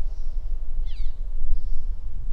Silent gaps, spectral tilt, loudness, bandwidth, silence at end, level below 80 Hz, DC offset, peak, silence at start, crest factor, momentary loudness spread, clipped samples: none; -7 dB/octave; -35 LUFS; 0.7 kHz; 0 s; -24 dBFS; under 0.1%; -6 dBFS; 0 s; 12 dB; 3 LU; under 0.1%